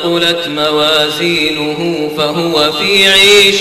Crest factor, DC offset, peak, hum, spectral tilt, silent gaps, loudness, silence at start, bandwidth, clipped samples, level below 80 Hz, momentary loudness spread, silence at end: 10 dB; under 0.1%; 0 dBFS; none; -2.5 dB/octave; none; -9 LUFS; 0 s; 17.5 kHz; under 0.1%; -42 dBFS; 11 LU; 0 s